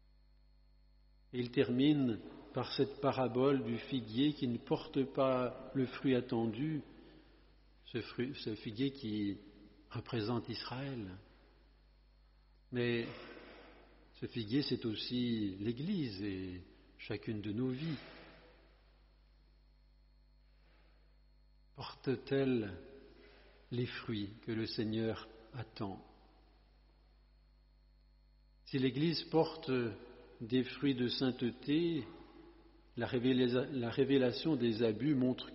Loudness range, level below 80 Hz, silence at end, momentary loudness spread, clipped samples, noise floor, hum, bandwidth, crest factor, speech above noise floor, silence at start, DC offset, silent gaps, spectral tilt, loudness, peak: 9 LU; -66 dBFS; 0 s; 17 LU; under 0.1%; -66 dBFS; 50 Hz at -65 dBFS; 5.8 kHz; 20 dB; 30 dB; 1.3 s; under 0.1%; none; -5.5 dB/octave; -37 LUFS; -18 dBFS